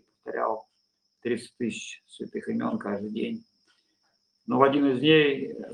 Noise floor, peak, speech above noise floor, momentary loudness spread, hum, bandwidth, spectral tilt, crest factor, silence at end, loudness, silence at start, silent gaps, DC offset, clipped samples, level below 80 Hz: -74 dBFS; -4 dBFS; 48 dB; 17 LU; none; 10.5 kHz; -5.5 dB/octave; 24 dB; 0 s; -27 LUFS; 0.25 s; none; under 0.1%; under 0.1%; -72 dBFS